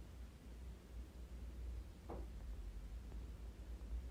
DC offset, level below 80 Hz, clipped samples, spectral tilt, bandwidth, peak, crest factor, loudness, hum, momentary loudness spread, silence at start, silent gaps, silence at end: under 0.1%; -52 dBFS; under 0.1%; -6.5 dB/octave; 16 kHz; -38 dBFS; 12 dB; -54 LUFS; none; 5 LU; 0 s; none; 0 s